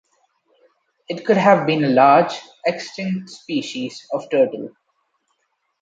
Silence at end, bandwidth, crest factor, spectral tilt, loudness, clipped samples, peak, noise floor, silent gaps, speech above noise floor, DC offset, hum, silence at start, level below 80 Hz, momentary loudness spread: 1.15 s; 9 kHz; 20 dB; -6 dB/octave; -19 LUFS; under 0.1%; -2 dBFS; -71 dBFS; none; 52 dB; under 0.1%; none; 1.1 s; -70 dBFS; 15 LU